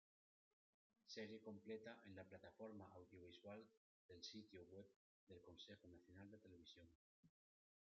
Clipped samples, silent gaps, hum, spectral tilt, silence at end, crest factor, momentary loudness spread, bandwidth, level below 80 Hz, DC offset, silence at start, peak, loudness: under 0.1%; 3.77-4.09 s, 4.96-5.27 s, 6.95-7.23 s; none; -4 dB/octave; 0.6 s; 22 dB; 10 LU; 7.2 kHz; under -90 dBFS; under 0.1%; 1.05 s; -42 dBFS; -61 LUFS